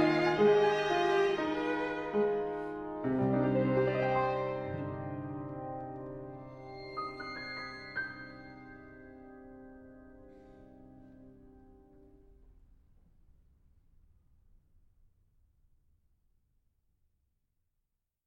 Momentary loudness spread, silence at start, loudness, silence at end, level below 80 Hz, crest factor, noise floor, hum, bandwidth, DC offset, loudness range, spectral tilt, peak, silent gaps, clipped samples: 24 LU; 0 s; -33 LUFS; 6.55 s; -62 dBFS; 20 dB; -84 dBFS; none; 8.2 kHz; under 0.1%; 23 LU; -7 dB/octave; -16 dBFS; none; under 0.1%